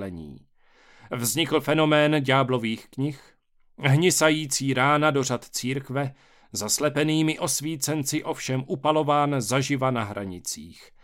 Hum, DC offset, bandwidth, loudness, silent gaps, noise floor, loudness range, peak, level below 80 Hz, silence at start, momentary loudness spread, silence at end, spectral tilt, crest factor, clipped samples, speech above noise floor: none; under 0.1%; 17 kHz; -24 LUFS; none; -56 dBFS; 3 LU; -6 dBFS; -60 dBFS; 0 s; 13 LU; 0.3 s; -4 dB/octave; 20 dB; under 0.1%; 32 dB